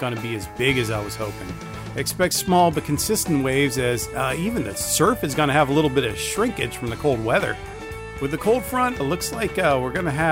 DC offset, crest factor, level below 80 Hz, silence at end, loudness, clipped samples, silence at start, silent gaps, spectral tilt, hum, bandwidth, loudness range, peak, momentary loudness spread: under 0.1%; 16 dB; -42 dBFS; 0 s; -22 LUFS; under 0.1%; 0 s; none; -4.5 dB/octave; none; 16 kHz; 3 LU; -6 dBFS; 11 LU